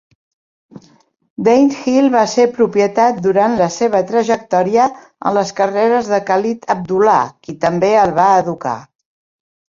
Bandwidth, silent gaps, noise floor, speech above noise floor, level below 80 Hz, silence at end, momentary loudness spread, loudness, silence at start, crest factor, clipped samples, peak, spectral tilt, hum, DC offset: 7.6 kHz; 1.30-1.36 s; -52 dBFS; 38 dB; -56 dBFS; 0.9 s; 8 LU; -14 LUFS; 0.75 s; 14 dB; under 0.1%; 0 dBFS; -5.5 dB/octave; none; under 0.1%